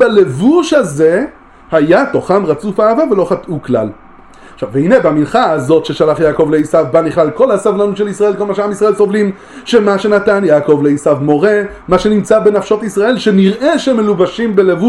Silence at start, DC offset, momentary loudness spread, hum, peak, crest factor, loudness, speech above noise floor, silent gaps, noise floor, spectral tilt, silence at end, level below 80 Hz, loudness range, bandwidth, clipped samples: 0 s; under 0.1%; 6 LU; none; 0 dBFS; 10 dB; -11 LUFS; 26 dB; none; -37 dBFS; -6.5 dB/octave; 0 s; -44 dBFS; 2 LU; 12 kHz; under 0.1%